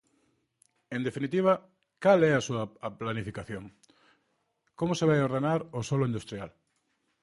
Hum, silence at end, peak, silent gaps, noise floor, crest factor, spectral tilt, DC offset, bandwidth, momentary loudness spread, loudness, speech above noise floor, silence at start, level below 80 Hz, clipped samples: none; 0.75 s; -10 dBFS; none; -76 dBFS; 20 dB; -6.5 dB/octave; under 0.1%; 11.5 kHz; 16 LU; -29 LUFS; 48 dB; 0.9 s; -62 dBFS; under 0.1%